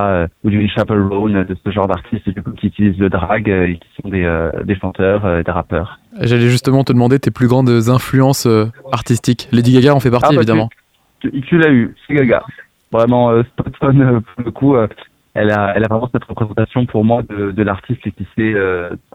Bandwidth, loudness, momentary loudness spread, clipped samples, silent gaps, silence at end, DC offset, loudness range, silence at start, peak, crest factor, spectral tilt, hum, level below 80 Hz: 15.5 kHz; -14 LUFS; 10 LU; under 0.1%; none; 0.15 s; under 0.1%; 4 LU; 0 s; 0 dBFS; 14 dB; -7 dB/octave; none; -38 dBFS